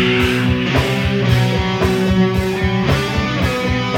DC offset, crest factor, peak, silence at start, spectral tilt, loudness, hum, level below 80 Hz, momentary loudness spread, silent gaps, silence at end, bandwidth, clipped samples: under 0.1%; 14 dB; -2 dBFS; 0 s; -6 dB/octave; -16 LUFS; none; -28 dBFS; 3 LU; none; 0 s; 16.5 kHz; under 0.1%